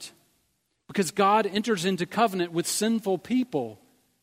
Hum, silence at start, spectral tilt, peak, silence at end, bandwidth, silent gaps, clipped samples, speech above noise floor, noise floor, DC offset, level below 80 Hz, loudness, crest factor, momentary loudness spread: none; 0 s; -4 dB/octave; -8 dBFS; 0.5 s; 16 kHz; none; under 0.1%; 48 dB; -73 dBFS; under 0.1%; -72 dBFS; -26 LUFS; 20 dB; 10 LU